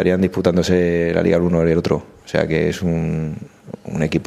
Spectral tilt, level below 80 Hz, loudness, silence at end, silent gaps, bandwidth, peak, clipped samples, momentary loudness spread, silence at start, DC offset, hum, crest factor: -7 dB/octave; -40 dBFS; -18 LUFS; 0.05 s; none; 13 kHz; 0 dBFS; under 0.1%; 12 LU; 0 s; under 0.1%; none; 18 dB